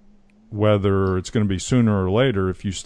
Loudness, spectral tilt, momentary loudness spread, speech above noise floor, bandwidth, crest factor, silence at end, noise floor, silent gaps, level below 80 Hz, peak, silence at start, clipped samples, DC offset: -20 LUFS; -6.5 dB/octave; 5 LU; 32 dB; 10 kHz; 14 dB; 0.05 s; -51 dBFS; none; -46 dBFS; -6 dBFS; 0.5 s; under 0.1%; under 0.1%